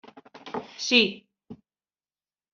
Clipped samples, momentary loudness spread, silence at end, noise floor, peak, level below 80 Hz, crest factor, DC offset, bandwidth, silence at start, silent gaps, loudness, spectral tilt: under 0.1%; 25 LU; 1 s; under -90 dBFS; -4 dBFS; -74 dBFS; 26 dB; under 0.1%; 7.4 kHz; 0.45 s; none; -22 LUFS; -0.5 dB/octave